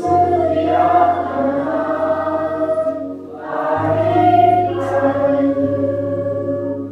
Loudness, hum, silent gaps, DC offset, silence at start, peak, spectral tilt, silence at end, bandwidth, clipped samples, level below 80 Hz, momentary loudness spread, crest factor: -17 LUFS; none; none; under 0.1%; 0 s; -2 dBFS; -8.5 dB/octave; 0 s; 8 kHz; under 0.1%; -54 dBFS; 9 LU; 14 dB